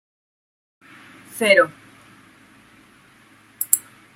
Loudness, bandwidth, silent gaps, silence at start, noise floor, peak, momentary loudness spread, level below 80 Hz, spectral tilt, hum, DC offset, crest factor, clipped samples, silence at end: -19 LUFS; 16 kHz; none; 1.35 s; -52 dBFS; 0 dBFS; 13 LU; -72 dBFS; -1.5 dB/octave; none; under 0.1%; 26 dB; under 0.1%; 0.35 s